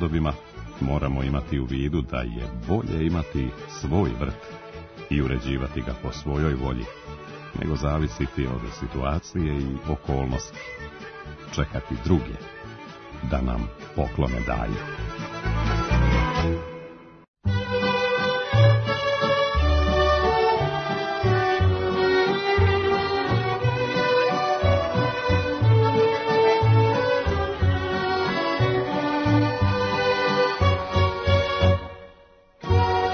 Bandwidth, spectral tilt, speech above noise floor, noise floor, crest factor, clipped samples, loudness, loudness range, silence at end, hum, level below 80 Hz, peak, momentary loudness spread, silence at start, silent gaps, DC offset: 6.6 kHz; -7 dB/octave; 27 dB; -53 dBFS; 16 dB; under 0.1%; -24 LUFS; 8 LU; 0 s; none; -34 dBFS; -6 dBFS; 15 LU; 0 s; 17.28-17.34 s; under 0.1%